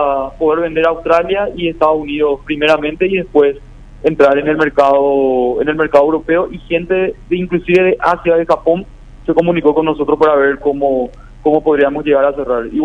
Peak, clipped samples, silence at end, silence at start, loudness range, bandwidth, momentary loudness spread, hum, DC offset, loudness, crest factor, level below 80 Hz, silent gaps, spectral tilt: 0 dBFS; 0.2%; 0 s; 0 s; 2 LU; 8 kHz; 7 LU; none; under 0.1%; -13 LUFS; 14 dB; -38 dBFS; none; -7 dB/octave